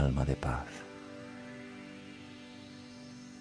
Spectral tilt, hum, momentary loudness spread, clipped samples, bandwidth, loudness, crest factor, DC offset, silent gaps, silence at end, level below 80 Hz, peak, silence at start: -7 dB/octave; none; 16 LU; under 0.1%; 10.5 kHz; -40 LUFS; 22 dB; under 0.1%; none; 0 s; -44 dBFS; -16 dBFS; 0 s